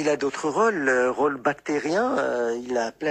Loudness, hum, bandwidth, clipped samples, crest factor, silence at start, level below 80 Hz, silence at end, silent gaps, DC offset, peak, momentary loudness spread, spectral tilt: -24 LUFS; none; 10 kHz; under 0.1%; 14 dB; 0 s; -64 dBFS; 0 s; none; under 0.1%; -8 dBFS; 5 LU; -4.5 dB/octave